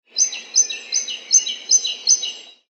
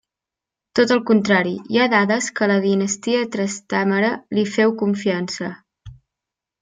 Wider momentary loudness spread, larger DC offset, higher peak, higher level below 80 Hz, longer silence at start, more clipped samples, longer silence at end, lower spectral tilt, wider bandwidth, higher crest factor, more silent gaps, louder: about the same, 6 LU vs 8 LU; neither; about the same, -2 dBFS vs -2 dBFS; second, under -90 dBFS vs -60 dBFS; second, 0.15 s vs 0.75 s; neither; second, 0.2 s vs 0.7 s; second, 5.5 dB/octave vs -4.5 dB/octave; second, 8.4 kHz vs 9.4 kHz; about the same, 18 dB vs 18 dB; neither; about the same, -17 LUFS vs -19 LUFS